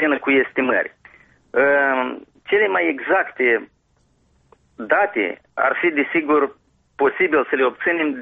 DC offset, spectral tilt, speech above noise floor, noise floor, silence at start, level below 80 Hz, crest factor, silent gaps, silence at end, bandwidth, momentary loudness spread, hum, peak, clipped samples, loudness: under 0.1%; -7 dB/octave; 43 dB; -62 dBFS; 0 s; -62 dBFS; 16 dB; none; 0 s; 4.5 kHz; 7 LU; none; -4 dBFS; under 0.1%; -19 LUFS